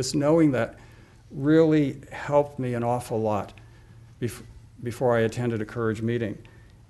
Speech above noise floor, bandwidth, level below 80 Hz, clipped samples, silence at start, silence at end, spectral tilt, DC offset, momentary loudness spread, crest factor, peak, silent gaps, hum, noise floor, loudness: 25 dB; 12 kHz; -54 dBFS; under 0.1%; 0 s; 0.4 s; -6.5 dB/octave; under 0.1%; 16 LU; 18 dB; -8 dBFS; none; none; -49 dBFS; -25 LUFS